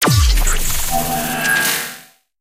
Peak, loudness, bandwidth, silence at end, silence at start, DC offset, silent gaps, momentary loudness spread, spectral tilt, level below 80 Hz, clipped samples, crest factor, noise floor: -2 dBFS; -16 LUFS; 16.5 kHz; 0.4 s; 0 s; under 0.1%; none; 7 LU; -3 dB/octave; -20 dBFS; under 0.1%; 14 dB; -39 dBFS